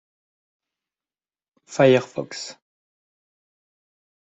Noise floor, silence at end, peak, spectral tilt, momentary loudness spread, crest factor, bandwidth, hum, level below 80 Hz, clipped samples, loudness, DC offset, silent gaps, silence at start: under -90 dBFS; 1.7 s; -2 dBFS; -5.5 dB/octave; 17 LU; 24 dB; 8.2 kHz; none; -70 dBFS; under 0.1%; -19 LUFS; under 0.1%; none; 1.7 s